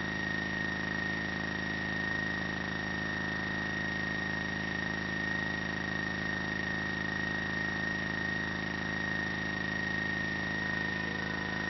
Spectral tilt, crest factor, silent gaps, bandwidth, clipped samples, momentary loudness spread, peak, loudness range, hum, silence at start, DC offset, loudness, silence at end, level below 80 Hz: -3 dB/octave; 14 dB; none; 6 kHz; under 0.1%; 2 LU; -20 dBFS; 1 LU; none; 0 s; under 0.1%; -33 LUFS; 0 s; -52 dBFS